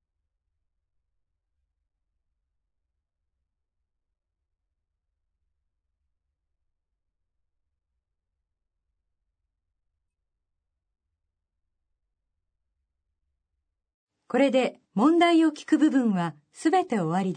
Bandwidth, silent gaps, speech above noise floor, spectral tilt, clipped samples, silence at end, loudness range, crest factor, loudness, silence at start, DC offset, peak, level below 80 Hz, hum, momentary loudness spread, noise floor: 9.6 kHz; none; 60 dB; -6 dB/octave; under 0.1%; 0 s; 8 LU; 22 dB; -24 LUFS; 14.3 s; under 0.1%; -10 dBFS; -82 dBFS; none; 9 LU; -83 dBFS